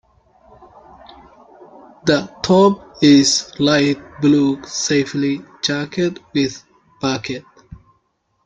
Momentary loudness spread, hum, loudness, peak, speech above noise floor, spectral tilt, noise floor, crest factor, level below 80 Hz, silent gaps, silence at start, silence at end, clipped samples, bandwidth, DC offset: 11 LU; none; -17 LUFS; -2 dBFS; 49 dB; -4.5 dB/octave; -66 dBFS; 18 dB; -54 dBFS; none; 2.05 s; 0.7 s; under 0.1%; 9.2 kHz; under 0.1%